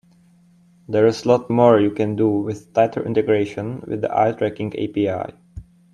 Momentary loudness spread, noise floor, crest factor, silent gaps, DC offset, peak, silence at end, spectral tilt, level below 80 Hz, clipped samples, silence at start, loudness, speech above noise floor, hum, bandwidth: 11 LU; -53 dBFS; 20 dB; none; under 0.1%; 0 dBFS; 0.3 s; -7.5 dB/octave; -54 dBFS; under 0.1%; 0.9 s; -19 LUFS; 35 dB; none; 9.8 kHz